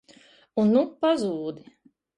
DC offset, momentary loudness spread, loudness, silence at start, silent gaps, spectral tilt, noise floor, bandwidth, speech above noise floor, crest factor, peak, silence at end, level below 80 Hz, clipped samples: under 0.1%; 14 LU; -24 LUFS; 0.55 s; none; -7 dB/octave; -55 dBFS; 11 kHz; 32 dB; 16 dB; -10 dBFS; 0.6 s; -68 dBFS; under 0.1%